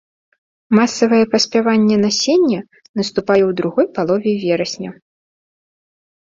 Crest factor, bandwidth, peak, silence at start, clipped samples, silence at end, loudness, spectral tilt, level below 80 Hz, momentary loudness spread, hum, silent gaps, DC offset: 16 dB; 7.8 kHz; -2 dBFS; 0.7 s; under 0.1%; 1.35 s; -16 LUFS; -4.5 dB/octave; -58 dBFS; 10 LU; none; 2.89-2.94 s; under 0.1%